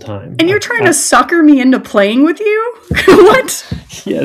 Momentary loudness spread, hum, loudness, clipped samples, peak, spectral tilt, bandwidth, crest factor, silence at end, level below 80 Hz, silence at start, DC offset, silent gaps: 15 LU; none; -9 LUFS; 3%; 0 dBFS; -4 dB/octave; 15 kHz; 10 dB; 0 s; -38 dBFS; 0.05 s; under 0.1%; none